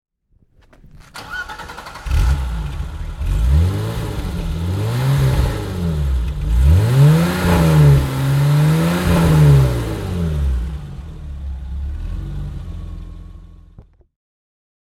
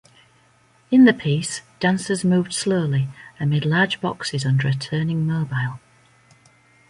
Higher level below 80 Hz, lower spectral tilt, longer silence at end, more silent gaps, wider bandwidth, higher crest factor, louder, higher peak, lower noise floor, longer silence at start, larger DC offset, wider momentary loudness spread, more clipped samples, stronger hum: first, -22 dBFS vs -58 dBFS; first, -7 dB/octave vs -5.5 dB/octave; about the same, 1.1 s vs 1.15 s; neither; first, 15.5 kHz vs 11.5 kHz; about the same, 16 dB vs 18 dB; first, -17 LUFS vs -21 LUFS; about the same, -2 dBFS vs -4 dBFS; about the same, -56 dBFS vs -57 dBFS; about the same, 0.95 s vs 0.9 s; neither; first, 19 LU vs 11 LU; neither; neither